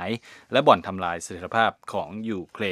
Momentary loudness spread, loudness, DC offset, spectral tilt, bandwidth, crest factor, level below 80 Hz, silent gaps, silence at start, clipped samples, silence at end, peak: 13 LU; -25 LUFS; under 0.1%; -4.5 dB/octave; 14 kHz; 24 dB; -62 dBFS; none; 0 s; under 0.1%; 0 s; -2 dBFS